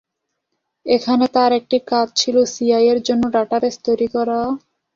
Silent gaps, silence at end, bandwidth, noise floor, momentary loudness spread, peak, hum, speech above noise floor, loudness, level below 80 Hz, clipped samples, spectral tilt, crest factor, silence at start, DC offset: none; 0.35 s; 7.6 kHz; -76 dBFS; 5 LU; -2 dBFS; none; 59 dB; -17 LUFS; -56 dBFS; under 0.1%; -3.5 dB/octave; 16 dB; 0.85 s; under 0.1%